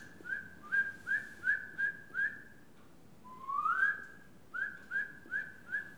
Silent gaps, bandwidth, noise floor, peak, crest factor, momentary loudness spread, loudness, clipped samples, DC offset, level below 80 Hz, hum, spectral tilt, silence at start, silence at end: none; over 20 kHz; -60 dBFS; -20 dBFS; 18 dB; 11 LU; -36 LUFS; under 0.1%; 0.1%; -74 dBFS; none; -3.5 dB/octave; 0 s; 0 s